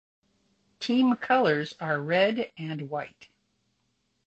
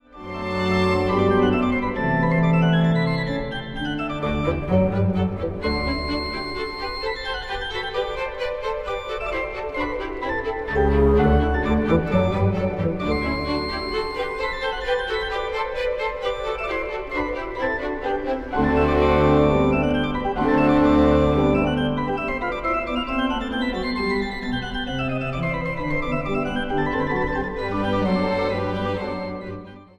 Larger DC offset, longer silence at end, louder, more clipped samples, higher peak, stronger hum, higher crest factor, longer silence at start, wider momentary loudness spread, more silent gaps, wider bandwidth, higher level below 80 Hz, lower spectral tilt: neither; first, 1.2 s vs 0.15 s; second, -27 LUFS vs -23 LUFS; neither; second, -10 dBFS vs -6 dBFS; neither; about the same, 18 dB vs 16 dB; first, 0.8 s vs 0.1 s; first, 13 LU vs 9 LU; neither; second, 8 kHz vs 10 kHz; second, -72 dBFS vs -34 dBFS; about the same, -6.5 dB/octave vs -7.5 dB/octave